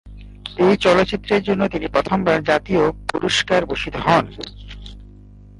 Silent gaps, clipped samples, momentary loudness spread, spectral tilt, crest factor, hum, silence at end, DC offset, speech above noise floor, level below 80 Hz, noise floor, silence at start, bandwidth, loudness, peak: none; under 0.1%; 18 LU; -5 dB/octave; 16 dB; 50 Hz at -40 dBFS; 0.55 s; under 0.1%; 24 dB; -40 dBFS; -42 dBFS; 0.05 s; 11.5 kHz; -18 LUFS; -4 dBFS